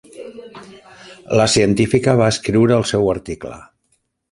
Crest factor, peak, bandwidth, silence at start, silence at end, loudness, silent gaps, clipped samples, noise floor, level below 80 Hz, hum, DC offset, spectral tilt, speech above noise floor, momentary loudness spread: 18 dB; 0 dBFS; 11.5 kHz; 0.15 s; 0.7 s; -16 LUFS; none; under 0.1%; -66 dBFS; -44 dBFS; none; under 0.1%; -5 dB/octave; 50 dB; 21 LU